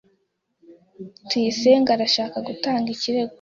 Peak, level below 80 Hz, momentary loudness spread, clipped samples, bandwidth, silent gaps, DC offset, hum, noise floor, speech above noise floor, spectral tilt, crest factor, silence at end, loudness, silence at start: -4 dBFS; -66 dBFS; 20 LU; under 0.1%; 7.6 kHz; none; under 0.1%; none; -70 dBFS; 49 dB; -4 dB/octave; 18 dB; 0.05 s; -21 LUFS; 0.7 s